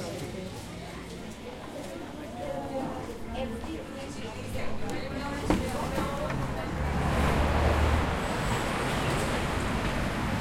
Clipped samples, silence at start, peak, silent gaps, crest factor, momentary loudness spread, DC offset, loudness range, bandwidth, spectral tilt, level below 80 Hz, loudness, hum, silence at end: under 0.1%; 0 s; -12 dBFS; none; 20 dB; 14 LU; under 0.1%; 9 LU; 16.5 kHz; -5.5 dB/octave; -38 dBFS; -31 LUFS; none; 0 s